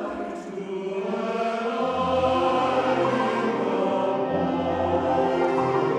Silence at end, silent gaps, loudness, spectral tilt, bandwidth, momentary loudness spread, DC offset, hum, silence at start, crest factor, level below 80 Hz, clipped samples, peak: 0 s; none; -24 LUFS; -6.5 dB/octave; 10 kHz; 9 LU; under 0.1%; none; 0 s; 14 dB; -56 dBFS; under 0.1%; -10 dBFS